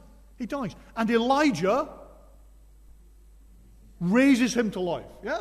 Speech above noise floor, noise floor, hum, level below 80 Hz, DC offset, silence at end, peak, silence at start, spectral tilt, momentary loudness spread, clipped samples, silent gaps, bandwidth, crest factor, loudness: 28 dB; -52 dBFS; none; -52 dBFS; under 0.1%; 0 s; -10 dBFS; 0.4 s; -5.5 dB/octave; 14 LU; under 0.1%; none; 13.5 kHz; 16 dB; -25 LUFS